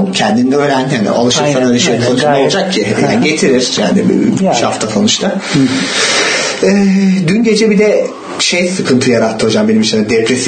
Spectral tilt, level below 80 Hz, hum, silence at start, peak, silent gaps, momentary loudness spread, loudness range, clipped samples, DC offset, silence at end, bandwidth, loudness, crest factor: -4.5 dB/octave; -50 dBFS; none; 0 s; 0 dBFS; none; 3 LU; 1 LU; under 0.1%; under 0.1%; 0 s; 9.4 kHz; -11 LUFS; 10 dB